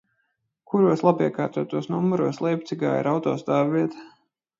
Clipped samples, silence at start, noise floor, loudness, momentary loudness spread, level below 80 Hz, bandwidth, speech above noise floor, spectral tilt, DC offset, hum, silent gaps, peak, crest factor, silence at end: under 0.1%; 0.7 s; -74 dBFS; -24 LUFS; 7 LU; -70 dBFS; 7.6 kHz; 52 dB; -8 dB/octave; under 0.1%; none; none; -4 dBFS; 20 dB; 0.5 s